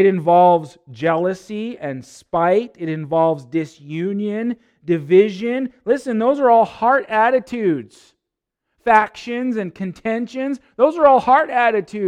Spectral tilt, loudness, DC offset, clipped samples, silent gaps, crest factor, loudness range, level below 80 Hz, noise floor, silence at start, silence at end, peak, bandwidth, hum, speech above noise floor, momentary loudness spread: -7 dB/octave; -18 LUFS; under 0.1%; under 0.1%; none; 18 dB; 4 LU; -58 dBFS; -81 dBFS; 0 s; 0 s; 0 dBFS; 10.5 kHz; none; 64 dB; 13 LU